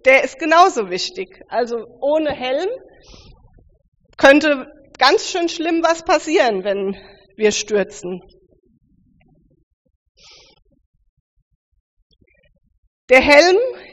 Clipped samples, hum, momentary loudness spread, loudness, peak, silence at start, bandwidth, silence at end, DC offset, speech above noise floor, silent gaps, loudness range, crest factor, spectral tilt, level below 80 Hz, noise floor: under 0.1%; none; 15 LU; -16 LUFS; 0 dBFS; 0.05 s; 8 kHz; 0.1 s; under 0.1%; 41 dB; 3.88-3.92 s, 9.63-9.85 s, 9.96-10.15 s, 10.86-10.94 s, 11.09-11.72 s, 11.80-12.10 s, 12.78-13.08 s; 9 LU; 18 dB; -1 dB/octave; -50 dBFS; -56 dBFS